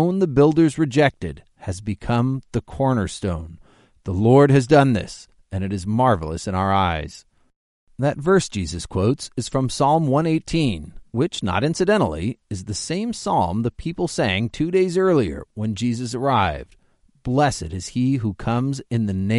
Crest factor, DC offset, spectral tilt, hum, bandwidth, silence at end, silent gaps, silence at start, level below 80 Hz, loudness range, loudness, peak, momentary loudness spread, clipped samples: 20 dB; under 0.1%; -6.5 dB/octave; none; 11.5 kHz; 0 s; 7.56-7.87 s; 0 s; -42 dBFS; 4 LU; -21 LUFS; -2 dBFS; 13 LU; under 0.1%